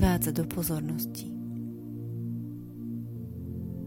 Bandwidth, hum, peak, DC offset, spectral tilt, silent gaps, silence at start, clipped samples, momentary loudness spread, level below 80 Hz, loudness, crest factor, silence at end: 17 kHz; none; -12 dBFS; under 0.1%; -6 dB/octave; none; 0 s; under 0.1%; 10 LU; -42 dBFS; -34 LUFS; 20 dB; 0 s